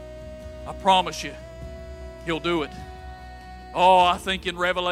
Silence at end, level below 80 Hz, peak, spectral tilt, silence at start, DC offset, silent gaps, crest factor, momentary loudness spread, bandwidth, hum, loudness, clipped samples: 0 s; -42 dBFS; -6 dBFS; -4 dB/octave; 0 s; under 0.1%; none; 20 dB; 22 LU; 15.5 kHz; none; -22 LUFS; under 0.1%